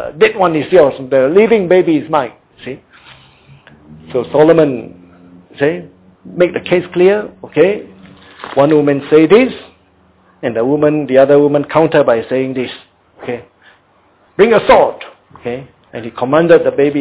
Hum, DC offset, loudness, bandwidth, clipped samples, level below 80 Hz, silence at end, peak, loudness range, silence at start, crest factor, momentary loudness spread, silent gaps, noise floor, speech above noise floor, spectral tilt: none; under 0.1%; -11 LUFS; 4 kHz; 0.2%; -48 dBFS; 0 s; 0 dBFS; 4 LU; 0 s; 12 dB; 19 LU; none; -51 dBFS; 40 dB; -10.5 dB/octave